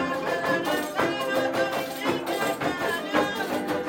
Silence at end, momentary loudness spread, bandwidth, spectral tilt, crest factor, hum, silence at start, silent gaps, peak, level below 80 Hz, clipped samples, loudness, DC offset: 0 s; 3 LU; 17 kHz; -4 dB/octave; 18 dB; none; 0 s; none; -10 dBFS; -62 dBFS; under 0.1%; -26 LUFS; under 0.1%